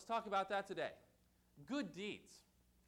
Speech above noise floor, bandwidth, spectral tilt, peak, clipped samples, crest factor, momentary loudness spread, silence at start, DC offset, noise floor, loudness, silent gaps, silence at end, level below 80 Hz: 29 dB; 18 kHz; -4.5 dB/octave; -30 dBFS; under 0.1%; 16 dB; 16 LU; 0 s; under 0.1%; -73 dBFS; -44 LUFS; none; 0.5 s; -78 dBFS